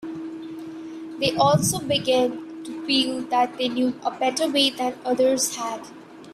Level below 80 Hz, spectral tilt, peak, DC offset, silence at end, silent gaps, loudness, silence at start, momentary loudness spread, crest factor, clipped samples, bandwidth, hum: -60 dBFS; -3.5 dB/octave; -6 dBFS; under 0.1%; 0 s; none; -22 LUFS; 0 s; 16 LU; 18 dB; under 0.1%; 16 kHz; none